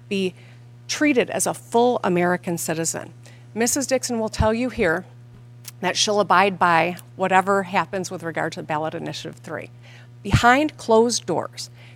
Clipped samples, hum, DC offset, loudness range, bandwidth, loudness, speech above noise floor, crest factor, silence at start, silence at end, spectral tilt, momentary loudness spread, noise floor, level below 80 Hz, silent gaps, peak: under 0.1%; none; under 0.1%; 4 LU; 16.5 kHz; -21 LUFS; 22 dB; 20 dB; 0.05 s; 0 s; -4 dB/octave; 16 LU; -44 dBFS; -44 dBFS; none; -2 dBFS